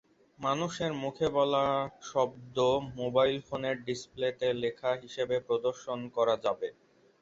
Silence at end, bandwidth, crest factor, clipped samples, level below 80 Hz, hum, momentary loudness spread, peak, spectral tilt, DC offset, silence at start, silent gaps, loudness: 0.5 s; 8 kHz; 18 dB; under 0.1%; -64 dBFS; none; 7 LU; -14 dBFS; -5 dB/octave; under 0.1%; 0.4 s; none; -31 LUFS